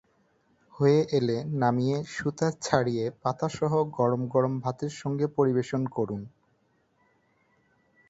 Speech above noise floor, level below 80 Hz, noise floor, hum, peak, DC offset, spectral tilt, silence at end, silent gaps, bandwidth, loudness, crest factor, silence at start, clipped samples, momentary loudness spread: 43 dB; -64 dBFS; -69 dBFS; none; -6 dBFS; under 0.1%; -7 dB/octave; 1.8 s; none; 8 kHz; -27 LUFS; 22 dB; 0.75 s; under 0.1%; 8 LU